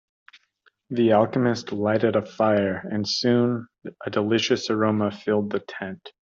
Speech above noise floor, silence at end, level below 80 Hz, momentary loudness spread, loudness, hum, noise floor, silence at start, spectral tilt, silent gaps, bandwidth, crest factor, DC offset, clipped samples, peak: 42 dB; 0.2 s; -66 dBFS; 13 LU; -23 LUFS; none; -65 dBFS; 0.9 s; -5.5 dB/octave; none; 7.6 kHz; 18 dB; under 0.1%; under 0.1%; -6 dBFS